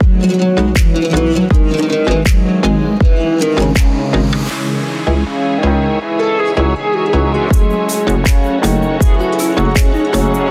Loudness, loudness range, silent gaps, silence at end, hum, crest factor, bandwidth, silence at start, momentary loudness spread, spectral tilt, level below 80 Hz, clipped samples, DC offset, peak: -14 LUFS; 2 LU; none; 0 s; none; 12 dB; 15.5 kHz; 0 s; 3 LU; -6 dB/octave; -16 dBFS; under 0.1%; under 0.1%; 0 dBFS